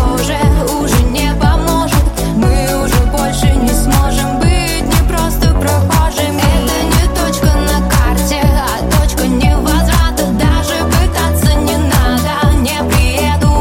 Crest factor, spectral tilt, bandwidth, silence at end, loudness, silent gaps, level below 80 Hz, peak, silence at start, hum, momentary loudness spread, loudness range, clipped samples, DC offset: 10 dB; -5 dB/octave; 17 kHz; 0 s; -12 LUFS; none; -14 dBFS; 0 dBFS; 0 s; none; 2 LU; 0 LU; under 0.1%; under 0.1%